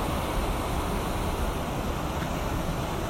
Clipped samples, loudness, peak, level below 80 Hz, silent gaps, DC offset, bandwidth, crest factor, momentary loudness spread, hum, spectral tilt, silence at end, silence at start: under 0.1%; -30 LUFS; -16 dBFS; -34 dBFS; none; under 0.1%; 16.5 kHz; 12 dB; 1 LU; none; -5.5 dB/octave; 0 s; 0 s